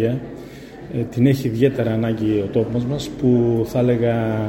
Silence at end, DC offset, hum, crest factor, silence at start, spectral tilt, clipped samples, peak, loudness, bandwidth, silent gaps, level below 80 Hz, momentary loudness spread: 0 s; under 0.1%; none; 16 dB; 0 s; -8 dB/octave; under 0.1%; -4 dBFS; -20 LUFS; 16.5 kHz; none; -46 dBFS; 12 LU